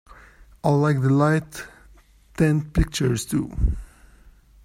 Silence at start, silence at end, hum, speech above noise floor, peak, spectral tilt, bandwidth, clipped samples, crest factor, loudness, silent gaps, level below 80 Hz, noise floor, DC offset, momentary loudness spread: 0.65 s; 0.8 s; none; 31 dB; -4 dBFS; -6.5 dB/octave; 15.5 kHz; under 0.1%; 18 dB; -22 LUFS; none; -34 dBFS; -52 dBFS; under 0.1%; 18 LU